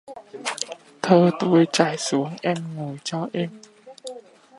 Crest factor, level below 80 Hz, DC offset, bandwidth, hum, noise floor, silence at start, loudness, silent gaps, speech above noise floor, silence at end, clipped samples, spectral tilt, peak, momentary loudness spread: 22 dB; -70 dBFS; under 0.1%; 11.5 kHz; none; -42 dBFS; 0.1 s; -22 LUFS; none; 21 dB; 0.4 s; under 0.1%; -5 dB/octave; -2 dBFS; 21 LU